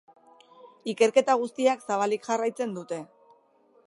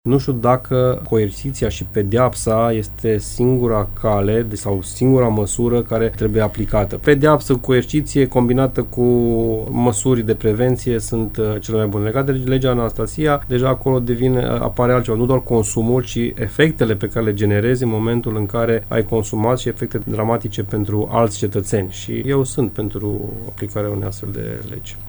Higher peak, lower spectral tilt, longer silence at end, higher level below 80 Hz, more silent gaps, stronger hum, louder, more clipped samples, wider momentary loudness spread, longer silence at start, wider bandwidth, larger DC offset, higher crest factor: second, -6 dBFS vs 0 dBFS; second, -4 dB/octave vs -6.5 dB/octave; first, 0.8 s vs 0 s; second, -84 dBFS vs -34 dBFS; neither; neither; second, -26 LUFS vs -18 LUFS; neither; first, 14 LU vs 7 LU; first, 0.65 s vs 0.05 s; second, 11.5 kHz vs over 20 kHz; neither; about the same, 22 dB vs 18 dB